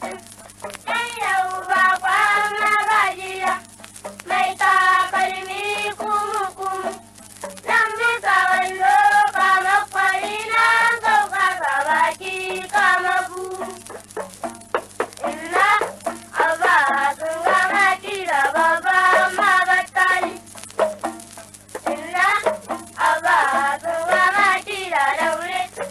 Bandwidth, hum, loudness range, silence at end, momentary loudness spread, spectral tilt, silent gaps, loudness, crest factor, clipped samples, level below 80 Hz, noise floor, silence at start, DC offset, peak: 13.5 kHz; 50 Hz at -55 dBFS; 5 LU; 0 s; 15 LU; -1.5 dB/octave; none; -18 LUFS; 14 dB; under 0.1%; -60 dBFS; -41 dBFS; 0 s; under 0.1%; -6 dBFS